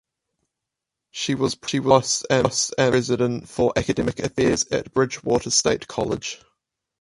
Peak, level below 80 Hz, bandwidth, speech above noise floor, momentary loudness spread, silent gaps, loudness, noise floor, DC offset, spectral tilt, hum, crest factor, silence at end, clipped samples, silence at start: 0 dBFS; -48 dBFS; 11.5 kHz; 63 dB; 8 LU; none; -22 LUFS; -84 dBFS; under 0.1%; -4 dB/octave; none; 22 dB; 0.65 s; under 0.1%; 1.15 s